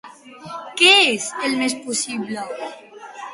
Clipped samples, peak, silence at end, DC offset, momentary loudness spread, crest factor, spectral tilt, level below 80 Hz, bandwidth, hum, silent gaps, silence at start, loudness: under 0.1%; 0 dBFS; 0 s; under 0.1%; 23 LU; 20 dB; -1 dB/octave; -70 dBFS; 11.5 kHz; none; none; 0.05 s; -17 LUFS